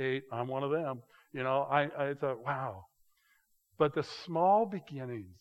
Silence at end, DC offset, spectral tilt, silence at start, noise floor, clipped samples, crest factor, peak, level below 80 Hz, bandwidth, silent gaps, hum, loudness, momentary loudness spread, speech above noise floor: 0.1 s; under 0.1%; -7 dB/octave; 0 s; -72 dBFS; under 0.1%; 20 dB; -12 dBFS; -80 dBFS; 13 kHz; none; none; -33 LUFS; 14 LU; 39 dB